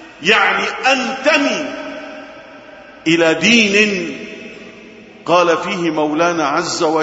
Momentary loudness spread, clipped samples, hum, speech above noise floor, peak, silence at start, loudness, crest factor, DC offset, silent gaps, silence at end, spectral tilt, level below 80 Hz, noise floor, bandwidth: 20 LU; under 0.1%; none; 24 dB; 0 dBFS; 0 s; -14 LUFS; 16 dB; under 0.1%; none; 0 s; -3.5 dB/octave; -58 dBFS; -38 dBFS; 8 kHz